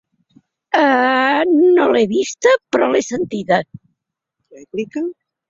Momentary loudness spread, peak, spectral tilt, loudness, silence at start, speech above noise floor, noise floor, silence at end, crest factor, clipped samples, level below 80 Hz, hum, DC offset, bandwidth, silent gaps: 13 LU; -2 dBFS; -4.5 dB/octave; -16 LUFS; 0.75 s; 62 dB; -77 dBFS; 0.35 s; 16 dB; under 0.1%; -62 dBFS; none; under 0.1%; 7.8 kHz; none